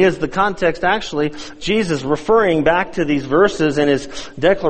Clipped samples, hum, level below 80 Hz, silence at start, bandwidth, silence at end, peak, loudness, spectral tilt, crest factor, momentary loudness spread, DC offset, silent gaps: under 0.1%; none; -40 dBFS; 0 s; 8.8 kHz; 0 s; 0 dBFS; -17 LUFS; -5.5 dB/octave; 16 dB; 7 LU; under 0.1%; none